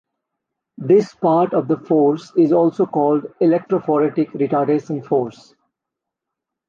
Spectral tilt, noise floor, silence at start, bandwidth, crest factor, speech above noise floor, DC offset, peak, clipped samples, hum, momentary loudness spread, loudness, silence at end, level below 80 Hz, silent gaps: -9 dB/octave; -83 dBFS; 0.8 s; 7.2 kHz; 14 dB; 66 dB; under 0.1%; -4 dBFS; under 0.1%; none; 6 LU; -18 LUFS; 1.4 s; -68 dBFS; none